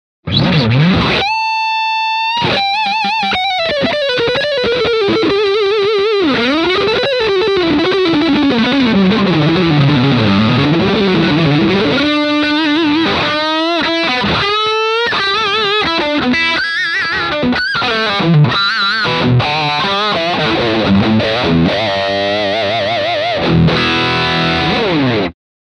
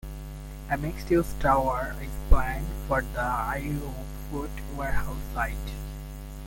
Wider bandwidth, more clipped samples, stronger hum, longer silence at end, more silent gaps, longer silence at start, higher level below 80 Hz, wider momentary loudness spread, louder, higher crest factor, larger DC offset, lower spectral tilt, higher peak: second, 10 kHz vs 17 kHz; neither; neither; first, 0.3 s vs 0 s; neither; first, 0.25 s vs 0.05 s; second, -38 dBFS vs -32 dBFS; second, 3 LU vs 15 LU; first, -12 LUFS vs -29 LUFS; second, 12 dB vs 24 dB; neither; about the same, -6 dB/octave vs -6.5 dB/octave; first, 0 dBFS vs -4 dBFS